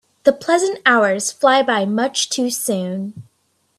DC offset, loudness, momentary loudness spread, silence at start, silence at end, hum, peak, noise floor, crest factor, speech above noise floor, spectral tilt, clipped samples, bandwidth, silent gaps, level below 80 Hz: under 0.1%; -17 LUFS; 8 LU; 0.25 s; 0.55 s; none; 0 dBFS; -65 dBFS; 18 dB; 48 dB; -3 dB/octave; under 0.1%; 14 kHz; none; -64 dBFS